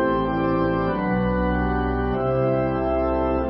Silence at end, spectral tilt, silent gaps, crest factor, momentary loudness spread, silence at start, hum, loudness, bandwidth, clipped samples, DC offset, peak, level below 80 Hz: 0 s; -12.5 dB/octave; none; 12 dB; 2 LU; 0 s; none; -22 LUFS; 5.6 kHz; under 0.1%; under 0.1%; -10 dBFS; -32 dBFS